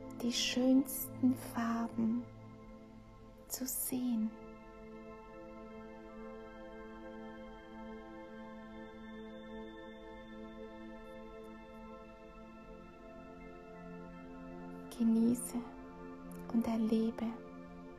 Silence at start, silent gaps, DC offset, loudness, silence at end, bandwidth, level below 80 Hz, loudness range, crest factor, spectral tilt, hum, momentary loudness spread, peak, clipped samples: 0 s; none; under 0.1%; -37 LUFS; 0 s; 14 kHz; -62 dBFS; 15 LU; 18 dB; -4 dB/octave; none; 20 LU; -20 dBFS; under 0.1%